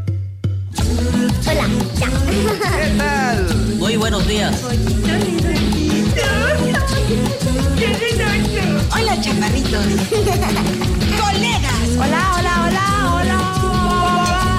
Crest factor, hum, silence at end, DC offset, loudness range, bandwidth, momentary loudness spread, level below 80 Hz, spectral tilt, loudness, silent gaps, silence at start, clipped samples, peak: 8 dB; none; 0 s; under 0.1%; 1 LU; 16 kHz; 3 LU; -24 dBFS; -5 dB/octave; -17 LUFS; none; 0 s; under 0.1%; -8 dBFS